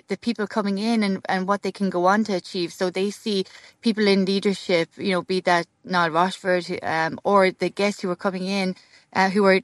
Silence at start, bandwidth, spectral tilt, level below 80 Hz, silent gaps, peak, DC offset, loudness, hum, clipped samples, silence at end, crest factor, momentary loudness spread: 0.1 s; 12 kHz; -5.5 dB/octave; -72 dBFS; none; -4 dBFS; under 0.1%; -23 LUFS; none; under 0.1%; 0 s; 18 dB; 7 LU